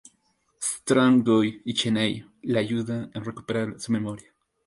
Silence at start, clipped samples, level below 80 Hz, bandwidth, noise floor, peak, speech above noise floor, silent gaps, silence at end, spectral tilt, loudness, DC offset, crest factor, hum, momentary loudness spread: 0.6 s; under 0.1%; -64 dBFS; 11.5 kHz; -69 dBFS; -8 dBFS; 45 dB; none; 0.45 s; -5 dB/octave; -25 LUFS; under 0.1%; 18 dB; none; 15 LU